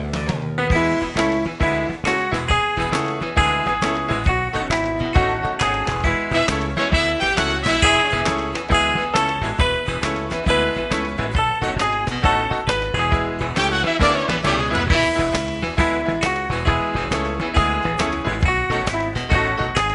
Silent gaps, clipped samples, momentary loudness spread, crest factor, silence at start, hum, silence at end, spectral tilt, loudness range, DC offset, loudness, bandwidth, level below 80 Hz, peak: none; under 0.1%; 5 LU; 18 dB; 0 s; none; 0 s; -5 dB/octave; 2 LU; under 0.1%; -20 LUFS; 11.5 kHz; -28 dBFS; -2 dBFS